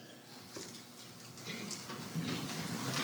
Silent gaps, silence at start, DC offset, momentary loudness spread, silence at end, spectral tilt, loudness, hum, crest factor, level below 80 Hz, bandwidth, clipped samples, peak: none; 0 s; under 0.1%; 12 LU; 0 s; -3.5 dB/octave; -43 LUFS; none; 20 dB; -76 dBFS; over 20 kHz; under 0.1%; -24 dBFS